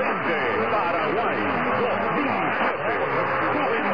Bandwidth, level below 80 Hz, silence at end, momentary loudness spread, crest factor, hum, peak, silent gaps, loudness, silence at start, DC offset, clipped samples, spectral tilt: 5.2 kHz; -56 dBFS; 0 s; 1 LU; 12 dB; none; -12 dBFS; none; -23 LUFS; 0 s; 0.6%; under 0.1%; -7.5 dB/octave